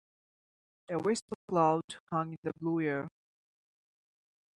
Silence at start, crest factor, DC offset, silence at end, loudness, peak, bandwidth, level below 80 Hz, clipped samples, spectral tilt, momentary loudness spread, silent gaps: 0.9 s; 20 dB; under 0.1%; 1.5 s; -33 LUFS; -14 dBFS; 11.5 kHz; -76 dBFS; under 0.1%; -6 dB/octave; 10 LU; 1.22-1.28 s, 1.35-1.48 s, 1.84-1.88 s, 2.00-2.07 s, 2.38-2.43 s